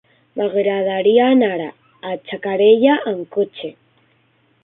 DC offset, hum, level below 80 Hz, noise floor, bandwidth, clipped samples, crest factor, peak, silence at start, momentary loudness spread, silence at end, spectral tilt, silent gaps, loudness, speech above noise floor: under 0.1%; none; -66 dBFS; -59 dBFS; 4 kHz; under 0.1%; 16 dB; -2 dBFS; 0.35 s; 19 LU; 0.9 s; -10.5 dB/octave; none; -17 LUFS; 43 dB